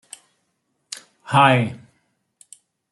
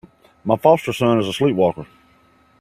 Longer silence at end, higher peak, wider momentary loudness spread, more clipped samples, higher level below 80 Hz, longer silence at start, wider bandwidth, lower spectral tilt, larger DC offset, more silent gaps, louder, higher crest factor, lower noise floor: first, 1.15 s vs 0.75 s; about the same, 0 dBFS vs 0 dBFS; first, 22 LU vs 10 LU; neither; second, -66 dBFS vs -56 dBFS; first, 1.25 s vs 0.45 s; second, 12 kHz vs 16 kHz; about the same, -5.5 dB/octave vs -6.5 dB/octave; neither; neither; about the same, -17 LUFS vs -18 LUFS; about the same, 22 dB vs 20 dB; first, -72 dBFS vs -55 dBFS